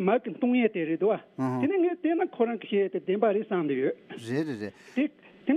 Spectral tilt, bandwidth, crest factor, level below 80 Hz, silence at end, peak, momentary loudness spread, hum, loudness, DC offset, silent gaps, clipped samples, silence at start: -8 dB/octave; 10.5 kHz; 16 dB; -80 dBFS; 0 s; -12 dBFS; 7 LU; none; -28 LUFS; under 0.1%; none; under 0.1%; 0 s